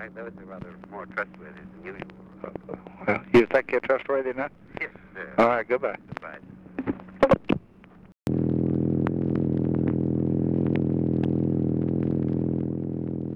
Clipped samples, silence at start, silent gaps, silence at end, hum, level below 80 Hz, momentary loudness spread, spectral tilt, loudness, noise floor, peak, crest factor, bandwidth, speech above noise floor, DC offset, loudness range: under 0.1%; 0 s; none; 0 s; none; -52 dBFS; 19 LU; -9 dB/octave; -26 LUFS; -51 dBFS; -8 dBFS; 18 dB; 7.6 kHz; 24 dB; under 0.1%; 3 LU